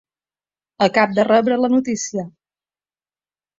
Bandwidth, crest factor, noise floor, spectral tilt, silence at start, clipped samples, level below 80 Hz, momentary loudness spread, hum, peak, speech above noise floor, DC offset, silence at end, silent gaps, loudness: 7.8 kHz; 18 dB; under -90 dBFS; -4.5 dB/octave; 0.8 s; under 0.1%; -62 dBFS; 11 LU; 50 Hz at -50 dBFS; -2 dBFS; over 73 dB; under 0.1%; 1.3 s; none; -17 LUFS